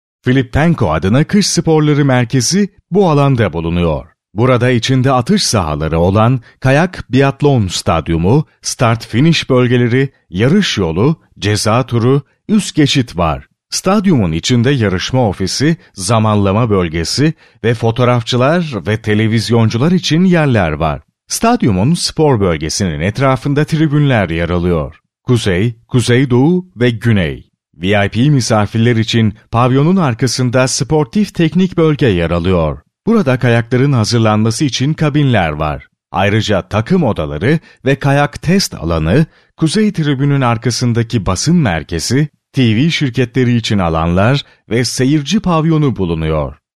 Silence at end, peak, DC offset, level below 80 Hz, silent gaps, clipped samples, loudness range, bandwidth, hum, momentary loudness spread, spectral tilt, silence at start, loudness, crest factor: 0.25 s; 0 dBFS; under 0.1%; -34 dBFS; none; under 0.1%; 2 LU; 13.5 kHz; none; 5 LU; -5.5 dB/octave; 0.25 s; -13 LUFS; 12 dB